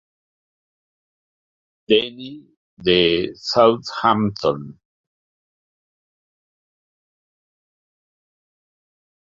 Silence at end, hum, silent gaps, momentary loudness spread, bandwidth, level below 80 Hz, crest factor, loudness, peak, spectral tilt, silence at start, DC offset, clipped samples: 4.65 s; none; 2.57-2.77 s; 16 LU; 7.6 kHz; -56 dBFS; 22 dB; -18 LUFS; -2 dBFS; -5.5 dB/octave; 1.9 s; under 0.1%; under 0.1%